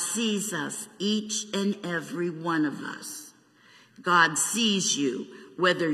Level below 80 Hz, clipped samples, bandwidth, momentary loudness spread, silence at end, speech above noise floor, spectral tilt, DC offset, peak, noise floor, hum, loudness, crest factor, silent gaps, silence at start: -80 dBFS; under 0.1%; 15.5 kHz; 14 LU; 0 s; 30 dB; -2.5 dB/octave; under 0.1%; -6 dBFS; -57 dBFS; none; -26 LUFS; 20 dB; none; 0 s